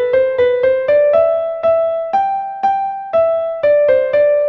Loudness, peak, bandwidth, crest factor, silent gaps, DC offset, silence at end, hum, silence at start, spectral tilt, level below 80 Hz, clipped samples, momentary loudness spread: -14 LUFS; -2 dBFS; 5.8 kHz; 12 dB; none; under 0.1%; 0 s; none; 0 s; -6 dB/octave; -54 dBFS; under 0.1%; 5 LU